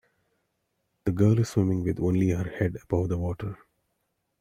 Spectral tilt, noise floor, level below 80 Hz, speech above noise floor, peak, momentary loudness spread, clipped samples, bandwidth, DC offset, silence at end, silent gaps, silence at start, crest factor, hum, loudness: -8.5 dB/octave; -77 dBFS; -52 dBFS; 52 dB; -10 dBFS; 11 LU; under 0.1%; 12 kHz; under 0.1%; 0.85 s; none; 1.05 s; 18 dB; none; -27 LUFS